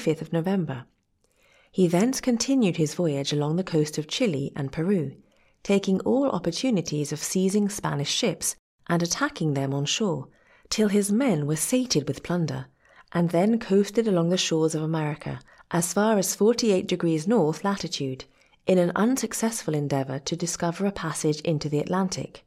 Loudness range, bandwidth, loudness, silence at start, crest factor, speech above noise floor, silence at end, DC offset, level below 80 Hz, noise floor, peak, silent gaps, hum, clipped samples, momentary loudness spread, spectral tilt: 2 LU; 15.5 kHz; -25 LUFS; 0 s; 16 dB; 43 dB; 0.05 s; under 0.1%; -58 dBFS; -68 dBFS; -10 dBFS; 8.59-8.79 s; none; under 0.1%; 8 LU; -5 dB/octave